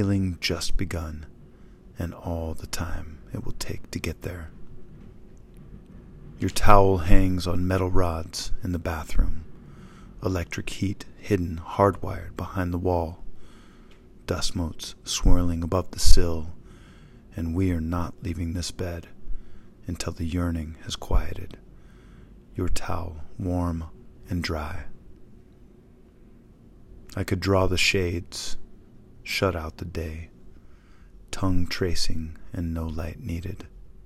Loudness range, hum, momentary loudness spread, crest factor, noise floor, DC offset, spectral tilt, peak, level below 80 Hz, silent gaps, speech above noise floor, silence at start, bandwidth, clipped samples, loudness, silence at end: 10 LU; none; 22 LU; 24 dB; -52 dBFS; under 0.1%; -5 dB/octave; 0 dBFS; -30 dBFS; none; 30 dB; 0 s; 13 kHz; under 0.1%; -28 LUFS; 0.15 s